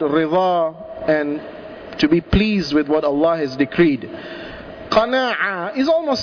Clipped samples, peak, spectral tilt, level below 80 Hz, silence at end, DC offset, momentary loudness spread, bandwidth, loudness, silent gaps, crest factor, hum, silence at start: under 0.1%; -4 dBFS; -6.5 dB/octave; -38 dBFS; 0 s; under 0.1%; 16 LU; 5.4 kHz; -18 LUFS; none; 14 dB; none; 0 s